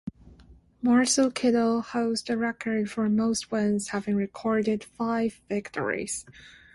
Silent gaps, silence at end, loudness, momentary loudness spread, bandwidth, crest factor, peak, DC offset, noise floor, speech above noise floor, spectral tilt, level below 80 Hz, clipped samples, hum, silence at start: none; 0.25 s; -27 LUFS; 8 LU; 11.5 kHz; 16 dB; -12 dBFS; under 0.1%; -54 dBFS; 28 dB; -4.5 dB/octave; -60 dBFS; under 0.1%; none; 0.05 s